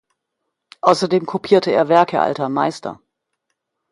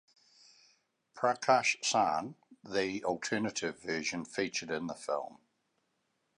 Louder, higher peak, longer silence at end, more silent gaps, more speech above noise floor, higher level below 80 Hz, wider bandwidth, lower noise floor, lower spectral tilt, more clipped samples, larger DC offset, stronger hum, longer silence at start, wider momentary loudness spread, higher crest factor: first, -17 LUFS vs -33 LUFS; first, 0 dBFS vs -12 dBFS; about the same, 0.95 s vs 1.05 s; neither; first, 61 dB vs 46 dB; first, -64 dBFS vs -74 dBFS; about the same, 11.5 kHz vs 10.5 kHz; about the same, -77 dBFS vs -79 dBFS; first, -5.5 dB/octave vs -3 dB/octave; neither; neither; neither; second, 0.85 s vs 1.15 s; second, 7 LU vs 10 LU; second, 18 dB vs 24 dB